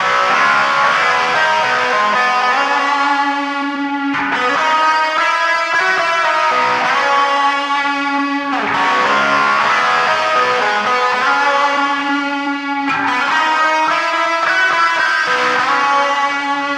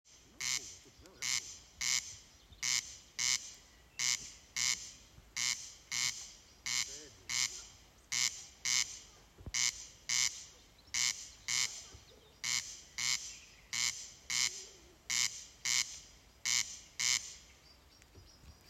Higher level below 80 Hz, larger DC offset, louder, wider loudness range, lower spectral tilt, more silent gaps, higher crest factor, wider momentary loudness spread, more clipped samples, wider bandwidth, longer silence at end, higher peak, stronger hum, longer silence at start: about the same, -66 dBFS vs -66 dBFS; neither; first, -14 LUFS vs -35 LUFS; about the same, 2 LU vs 2 LU; first, -2 dB/octave vs 2 dB/octave; neither; second, 14 dB vs 24 dB; second, 5 LU vs 17 LU; neither; second, 14 kHz vs 16 kHz; about the same, 0 s vs 0 s; first, -2 dBFS vs -16 dBFS; neither; about the same, 0 s vs 0.1 s